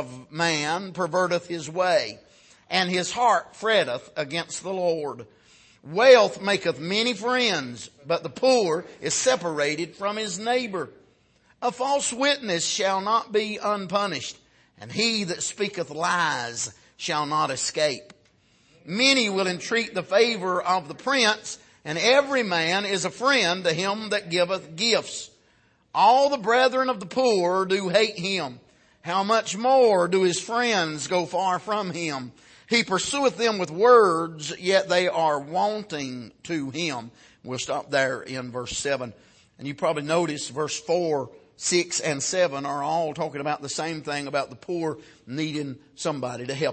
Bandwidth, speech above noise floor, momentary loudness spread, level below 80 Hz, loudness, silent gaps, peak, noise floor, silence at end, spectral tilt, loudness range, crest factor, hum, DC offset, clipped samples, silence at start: 8.8 kHz; 38 dB; 12 LU; -66 dBFS; -24 LUFS; none; -4 dBFS; -62 dBFS; 0 s; -3 dB/octave; 5 LU; 22 dB; none; under 0.1%; under 0.1%; 0 s